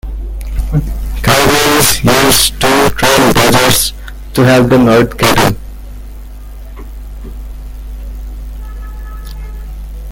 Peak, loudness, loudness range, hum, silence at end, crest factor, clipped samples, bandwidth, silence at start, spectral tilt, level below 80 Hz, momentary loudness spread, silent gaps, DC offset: 0 dBFS; -9 LUFS; 20 LU; none; 0 s; 12 dB; 0.2%; over 20 kHz; 0.05 s; -3.5 dB/octave; -22 dBFS; 23 LU; none; under 0.1%